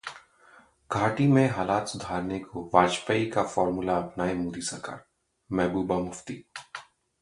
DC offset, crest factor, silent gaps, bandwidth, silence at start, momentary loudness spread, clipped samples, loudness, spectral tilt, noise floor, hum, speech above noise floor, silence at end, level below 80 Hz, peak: under 0.1%; 24 dB; none; 11.5 kHz; 0.05 s; 18 LU; under 0.1%; -27 LUFS; -5.5 dB/octave; -57 dBFS; none; 30 dB; 0.4 s; -56 dBFS; -4 dBFS